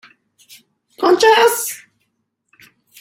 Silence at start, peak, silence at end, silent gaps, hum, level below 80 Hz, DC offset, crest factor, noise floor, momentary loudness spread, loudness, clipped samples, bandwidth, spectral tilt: 1 s; 0 dBFS; 1.25 s; none; none; -64 dBFS; under 0.1%; 18 dB; -71 dBFS; 14 LU; -14 LUFS; under 0.1%; 16.5 kHz; -1 dB/octave